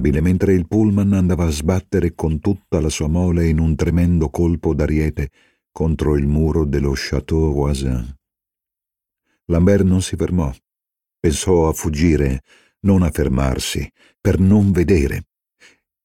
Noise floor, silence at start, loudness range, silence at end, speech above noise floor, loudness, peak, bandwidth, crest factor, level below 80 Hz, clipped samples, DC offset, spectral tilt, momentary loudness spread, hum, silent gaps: -86 dBFS; 0 s; 3 LU; 0.85 s; 70 dB; -18 LUFS; -2 dBFS; 16 kHz; 16 dB; -28 dBFS; under 0.1%; 0.3%; -7 dB/octave; 8 LU; none; none